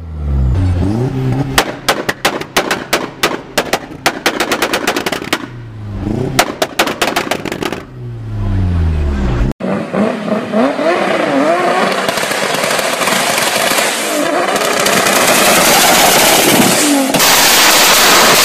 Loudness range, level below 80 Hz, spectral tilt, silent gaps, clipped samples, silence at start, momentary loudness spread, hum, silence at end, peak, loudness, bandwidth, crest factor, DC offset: 9 LU; -26 dBFS; -3 dB/octave; 9.52-9.59 s; under 0.1%; 0 s; 12 LU; none; 0 s; 0 dBFS; -11 LUFS; 16.5 kHz; 12 dB; under 0.1%